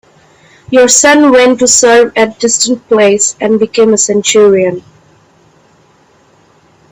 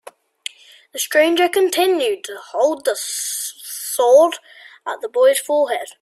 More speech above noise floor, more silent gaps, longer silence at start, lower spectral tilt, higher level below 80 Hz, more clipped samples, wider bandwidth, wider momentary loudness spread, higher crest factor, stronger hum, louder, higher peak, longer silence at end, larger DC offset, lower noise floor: first, 39 dB vs 20 dB; neither; second, 0.7 s vs 0.95 s; first, -2.5 dB/octave vs 0 dB/octave; first, -50 dBFS vs -70 dBFS; first, 0.2% vs under 0.1%; first, over 20 kHz vs 15.5 kHz; second, 7 LU vs 19 LU; second, 10 dB vs 16 dB; neither; first, -7 LUFS vs -18 LUFS; about the same, 0 dBFS vs -2 dBFS; first, 2.1 s vs 0.1 s; neither; first, -47 dBFS vs -36 dBFS